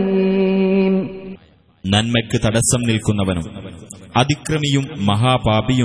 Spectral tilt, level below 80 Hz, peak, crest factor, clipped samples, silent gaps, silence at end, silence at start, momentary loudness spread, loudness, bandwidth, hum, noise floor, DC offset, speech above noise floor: -5 dB/octave; -40 dBFS; -2 dBFS; 16 dB; under 0.1%; none; 0 s; 0 s; 15 LU; -17 LUFS; 11 kHz; none; -46 dBFS; under 0.1%; 29 dB